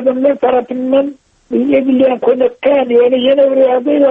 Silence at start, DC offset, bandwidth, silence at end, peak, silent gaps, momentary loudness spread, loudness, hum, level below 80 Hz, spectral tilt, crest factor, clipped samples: 0 s; under 0.1%; 3.8 kHz; 0 s; -2 dBFS; none; 5 LU; -12 LUFS; none; -54 dBFS; -7.5 dB/octave; 10 dB; under 0.1%